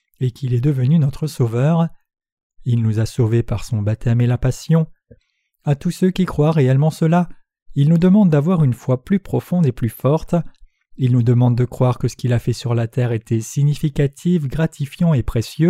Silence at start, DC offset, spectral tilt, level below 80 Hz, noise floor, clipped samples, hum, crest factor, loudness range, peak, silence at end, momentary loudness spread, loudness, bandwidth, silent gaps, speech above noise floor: 0.2 s; under 0.1%; -8 dB/octave; -38 dBFS; -63 dBFS; under 0.1%; none; 14 dB; 3 LU; -4 dBFS; 0 s; 8 LU; -18 LUFS; 14 kHz; 2.32-2.37 s, 2.43-2.50 s, 7.62-7.66 s; 46 dB